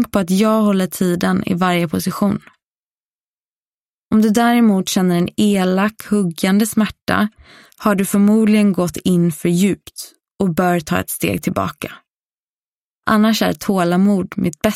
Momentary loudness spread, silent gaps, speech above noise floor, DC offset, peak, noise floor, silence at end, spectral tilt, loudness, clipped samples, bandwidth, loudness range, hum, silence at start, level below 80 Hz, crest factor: 8 LU; 2.66-4.11 s, 7.02-7.07 s, 10.31-10.35 s, 12.16-13.02 s; over 74 dB; under 0.1%; 0 dBFS; under -90 dBFS; 0 s; -5.5 dB/octave; -16 LUFS; under 0.1%; 16 kHz; 4 LU; none; 0 s; -50 dBFS; 16 dB